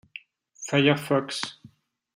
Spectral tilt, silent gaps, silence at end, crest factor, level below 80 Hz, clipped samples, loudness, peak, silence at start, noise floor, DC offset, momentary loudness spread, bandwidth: -5 dB/octave; none; 0.5 s; 22 dB; -70 dBFS; under 0.1%; -25 LUFS; -6 dBFS; 0.15 s; -56 dBFS; under 0.1%; 21 LU; 16 kHz